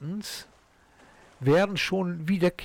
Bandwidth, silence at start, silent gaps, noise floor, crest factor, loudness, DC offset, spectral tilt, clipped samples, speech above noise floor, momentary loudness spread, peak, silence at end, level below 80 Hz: 17.5 kHz; 0 s; none; -59 dBFS; 12 dB; -26 LUFS; under 0.1%; -6 dB/octave; under 0.1%; 33 dB; 13 LU; -16 dBFS; 0 s; -58 dBFS